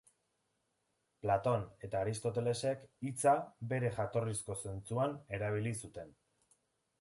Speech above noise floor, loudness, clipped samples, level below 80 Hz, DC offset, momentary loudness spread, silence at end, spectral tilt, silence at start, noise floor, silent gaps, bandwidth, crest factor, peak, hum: 46 dB; -37 LUFS; under 0.1%; -64 dBFS; under 0.1%; 10 LU; 0.9 s; -5.5 dB/octave; 1.25 s; -82 dBFS; none; 11.5 kHz; 20 dB; -18 dBFS; none